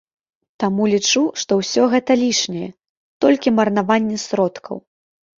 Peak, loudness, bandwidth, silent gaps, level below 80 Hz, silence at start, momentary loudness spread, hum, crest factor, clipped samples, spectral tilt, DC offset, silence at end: -2 dBFS; -18 LUFS; 7.6 kHz; 2.89-3.20 s; -60 dBFS; 0.6 s; 12 LU; none; 16 dB; under 0.1%; -4 dB/octave; under 0.1%; 0.6 s